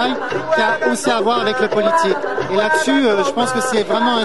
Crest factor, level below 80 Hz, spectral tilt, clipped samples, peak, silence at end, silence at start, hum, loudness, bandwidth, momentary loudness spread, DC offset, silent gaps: 14 dB; -58 dBFS; -3.5 dB/octave; under 0.1%; -2 dBFS; 0 s; 0 s; none; -16 LUFS; 12 kHz; 4 LU; 1%; none